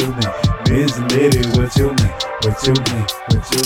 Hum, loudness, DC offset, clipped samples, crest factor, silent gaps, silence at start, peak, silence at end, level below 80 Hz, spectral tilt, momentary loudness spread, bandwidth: none; -16 LUFS; under 0.1%; under 0.1%; 12 dB; none; 0 s; -2 dBFS; 0 s; -28 dBFS; -5 dB/octave; 5 LU; 18 kHz